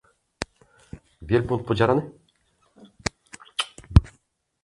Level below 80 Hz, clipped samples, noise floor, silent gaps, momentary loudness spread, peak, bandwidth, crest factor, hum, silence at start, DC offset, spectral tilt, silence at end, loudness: -32 dBFS; under 0.1%; -67 dBFS; none; 25 LU; 0 dBFS; 11.5 kHz; 26 dB; none; 0.4 s; under 0.1%; -6 dB/octave; 0.55 s; -25 LUFS